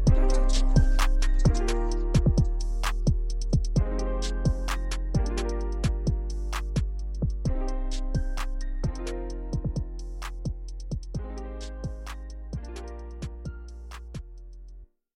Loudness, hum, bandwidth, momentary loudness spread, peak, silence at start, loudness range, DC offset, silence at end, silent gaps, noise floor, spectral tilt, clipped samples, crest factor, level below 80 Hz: -30 LUFS; none; 11.5 kHz; 15 LU; -8 dBFS; 0 s; 11 LU; under 0.1%; 0.3 s; none; -47 dBFS; -6 dB/octave; under 0.1%; 18 dB; -28 dBFS